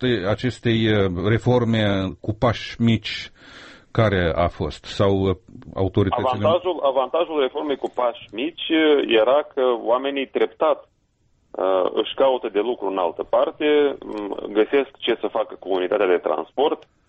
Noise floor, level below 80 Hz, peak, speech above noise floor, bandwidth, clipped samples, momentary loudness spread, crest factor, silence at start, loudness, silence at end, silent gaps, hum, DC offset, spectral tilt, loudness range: -64 dBFS; -46 dBFS; -6 dBFS; 43 dB; 8.4 kHz; under 0.1%; 8 LU; 14 dB; 0 s; -21 LUFS; 0.3 s; none; none; under 0.1%; -7 dB/octave; 2 LU